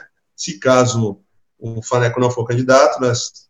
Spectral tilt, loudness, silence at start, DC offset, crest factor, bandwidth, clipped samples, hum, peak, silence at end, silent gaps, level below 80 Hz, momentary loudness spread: -5 dB/octave; -16 LUFS; 0.4 s; under 0.1%; 16 dB; 8.8 kHz; under 0.1%; none; 0 dBFS; 0.2 s; none; -58 dBFS; 16 LU